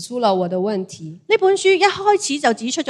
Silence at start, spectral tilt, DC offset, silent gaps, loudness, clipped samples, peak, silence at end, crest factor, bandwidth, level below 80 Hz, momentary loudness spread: 0 s; -3.5 dB/octave; under 0.1%; none; -17 LUFS; under 0.1%; 0 dBFS; 0 s; 18 dB; 12 kHz; -66 dBFS; 10 LU